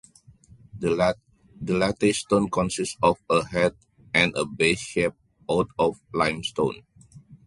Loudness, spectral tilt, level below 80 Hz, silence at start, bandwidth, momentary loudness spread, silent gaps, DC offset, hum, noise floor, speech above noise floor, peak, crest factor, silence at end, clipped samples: -24 LUFS; -4.5 dB/octave; -52 dBFS; 0.75 s; 11.5 kHz; 7 LU; none; under 0.1%; none; -53 dBFS; 29 dB; -4 dBFS; 20 dB; 0.1 s; under 0.1%